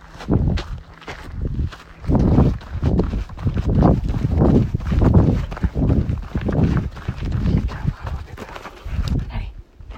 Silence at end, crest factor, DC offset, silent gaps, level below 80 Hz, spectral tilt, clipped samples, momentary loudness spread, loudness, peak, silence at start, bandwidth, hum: 0 s; 18 dB; under 0.1%; none; -26 dBFS; -9 dB/octave; under 0.1%; 17 LU; -20 LUFS; -2 dBFS; 0 s; 8.2 kHz; none